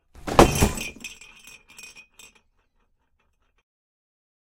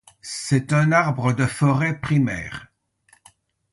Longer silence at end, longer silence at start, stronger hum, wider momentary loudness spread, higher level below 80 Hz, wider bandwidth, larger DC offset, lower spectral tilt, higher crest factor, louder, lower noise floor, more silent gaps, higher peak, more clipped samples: first, 3.35 s vs 1.05 s; about the same, 0.25 s vs 0.25 s; neither; first, 26 LU vs 14 LU; first, -36 dBFS vs -52 dBFS; first, 16.5 kHz vs 11.5 kHz; neither; second, -4.5 dB/octave vs -6 dB/octave; first, 26 dB vs 18 dB; about the same, -21 LUFS vs -21 LUFS; first, -69 dBFS vs -60 dBFS; neither; first, 0 dBFS vs -4 dBFS; neither